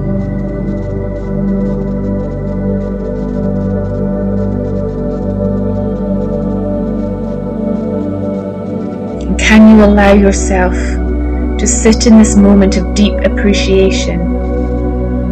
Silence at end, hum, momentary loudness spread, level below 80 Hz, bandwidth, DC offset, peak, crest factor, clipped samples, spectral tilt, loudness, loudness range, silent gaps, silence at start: 0 s; none; 12 LU; -18 dBFS; 9.2 kHz; under 0.1%; 0 dBFS; 10 dB; 0.9%; -6 dB/octave; -12 LUFS; 8 LU; none; 0 s